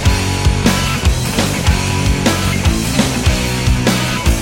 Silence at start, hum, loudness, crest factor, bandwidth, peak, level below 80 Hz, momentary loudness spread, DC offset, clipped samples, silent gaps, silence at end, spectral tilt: 0 s; none; -15 LUFS; 12 dB; 17 kHz; -2 dBFS; -20 dBFS; 2 LU; under 0.1%; under 0.1%; none; 0 s; -4.5 dB/octave